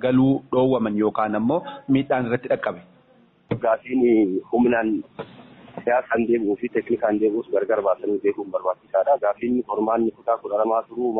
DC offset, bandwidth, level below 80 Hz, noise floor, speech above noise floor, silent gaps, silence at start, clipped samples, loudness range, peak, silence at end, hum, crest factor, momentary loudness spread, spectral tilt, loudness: under 0.1%; 4.1 kHz; -58 dBFS; -56 dBFS; 35 dB; none; 0 s; under 0.1%; 1 LU; -8 dBFS; 0 s; none; 14 dB; 7 LU; -6.5 dB/octave; -22 LUFS